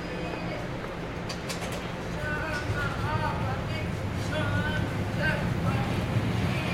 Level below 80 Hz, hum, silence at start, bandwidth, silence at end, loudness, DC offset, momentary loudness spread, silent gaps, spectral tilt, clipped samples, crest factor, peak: -42 dBFS; none; 0 s; 16 kHz; 0 s; -30 LUFS; under 0.1%; 6 LU; none; -6 dB/octave; under 0.1%; 14 dB; -14 dBFS